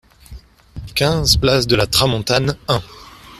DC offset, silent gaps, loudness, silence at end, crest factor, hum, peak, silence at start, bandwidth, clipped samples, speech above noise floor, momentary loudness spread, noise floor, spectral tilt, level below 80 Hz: under 0.1%; none; -16 LUFS; 0.05 s; 18 dB; none; 0 dBFS; 0.3 s; 14.5 kHz; under 0.1%; 23 dB; 8 LU; -39 dBFS; -4 dB/octave; -32 dBFS